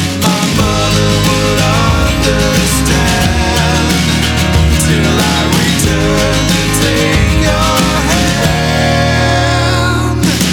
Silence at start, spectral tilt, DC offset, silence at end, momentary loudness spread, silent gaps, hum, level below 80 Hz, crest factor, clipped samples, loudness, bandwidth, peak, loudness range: 0 s; -4.5 dB/octave; under 0.1%; 0 s; 1 LU; none; none; -20 dBFS; 10 dB; under 0.1%; -11 LUFS; over 20 kHz; 0 dBFS; 0 LU